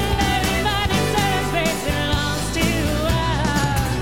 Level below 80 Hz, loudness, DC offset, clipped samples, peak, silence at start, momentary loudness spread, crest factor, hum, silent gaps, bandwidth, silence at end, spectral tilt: -28 dBFS; -20 LUFS; 1%; under 0.1%; -8 dBFS; 0 s; 2 LU; 12 dB; none; none; 16.5 kHz; 0 s; -4.5 dB/octave